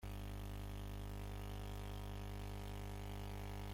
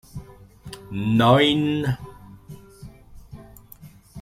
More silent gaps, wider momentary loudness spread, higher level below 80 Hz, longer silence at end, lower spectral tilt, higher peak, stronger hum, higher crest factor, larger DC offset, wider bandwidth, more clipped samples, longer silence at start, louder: neither; second, 0 LU vs 28 LU; about the same, -50 dBFS vs -50 dBFS; about the same, 0 s vs 0 s; about the same, -6 dB/octave vs -6.5 dB/octave; second, -36 dBFS vs -4 dBFS; first, 50 Hz at -50 dBFS vs none; second, 10 dB vs 22 dB; neither; about the same, 16.5 kHz vs 16 kHz; neither; second, 0 s vs 0.15 s; second, -49 LUFS vs -20 LUFS